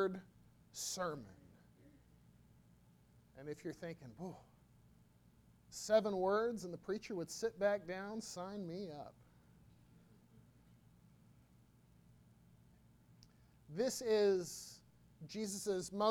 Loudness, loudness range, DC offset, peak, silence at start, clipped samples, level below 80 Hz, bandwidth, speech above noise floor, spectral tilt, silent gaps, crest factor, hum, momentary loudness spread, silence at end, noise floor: -41 LUFS; 14 LU; under 0.1%; -20 dBFS; 0 s; under 0.1%; -74 dBFS; 18 kHz; 28 dB; -4 dB/octave; none; 22 dB; 60 Hz at -70 dBFS; 19 LU; 0 s; -68 dBFS